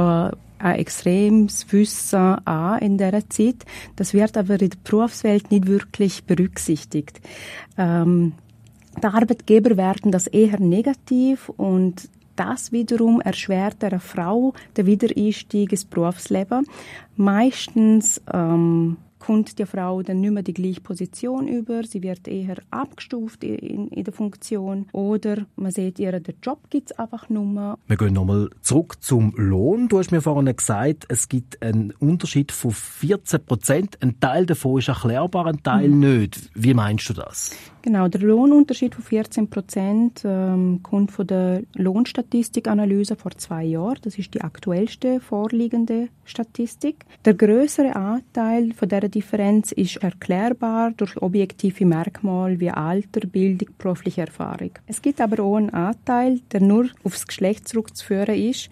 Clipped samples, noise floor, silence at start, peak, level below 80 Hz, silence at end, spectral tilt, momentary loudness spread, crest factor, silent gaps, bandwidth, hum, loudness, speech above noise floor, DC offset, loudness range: under 0.1%; -49 dBFS; 0 s; -2 dBFS; -54 dBFS; 0.05 s; -6.5 dB/octave; 11 LU; 18 dB; none; 15 kHz; none; -21 LUFS; 29 dB; under 0.1%; 6 LU